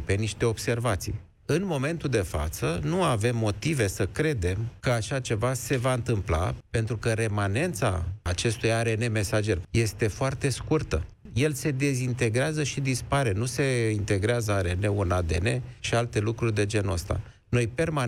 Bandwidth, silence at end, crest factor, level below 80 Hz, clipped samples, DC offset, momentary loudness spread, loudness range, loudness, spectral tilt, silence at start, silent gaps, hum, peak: 16 kHz; 0 s; 14 dB; -42 dBFS; under 0.1%; under 0.1%; 4 LU; 1 LU; -27 LUFS; -5.5 dB/octave; 0 s; none; none; -14 dBFS